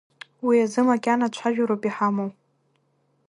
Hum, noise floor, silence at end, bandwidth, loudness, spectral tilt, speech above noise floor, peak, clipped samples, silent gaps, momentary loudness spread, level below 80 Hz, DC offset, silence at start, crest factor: none; -68 dBFS; 1 s; 11 kHz; -23 LUFS; -6 dB/octave; 46 dB; -8 dBFS; under 0.1%; none; 8 LU; -74 dBFS; under 0.1%; 0.45 s; 16 dB